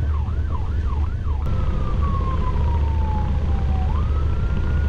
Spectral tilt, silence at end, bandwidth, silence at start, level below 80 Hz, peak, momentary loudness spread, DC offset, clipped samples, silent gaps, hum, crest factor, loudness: -8.5 dB/octave; 0 s; 5 kHz; 0 s; -22 dBFS; -10 dBFS; 3 LU; under 0.1%; under 0.1%; none; none; 8 dB; -23 LUFS